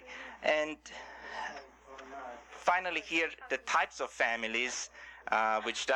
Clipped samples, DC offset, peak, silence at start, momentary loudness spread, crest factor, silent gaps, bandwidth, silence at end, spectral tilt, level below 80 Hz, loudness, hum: under 0.1%; under 0.1%; -14 dBFS; 0 s; 16 LU; 20 dB; none; 12 kHz; 0 s; -1 dB/octave; -68 dBFS; -33 LUFS; none